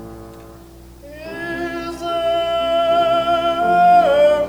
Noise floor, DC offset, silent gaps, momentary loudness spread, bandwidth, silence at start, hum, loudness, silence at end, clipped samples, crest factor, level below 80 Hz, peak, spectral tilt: -40 dBFS; under 0.1%; none; 19 LU; 19 kHz; 0 s; 60 Hz at -55 dBFS; -16 LUFS; 0 s; under 0.1%; 14 dB; -44 dBFS; -4 dBFS; -5 dB/octave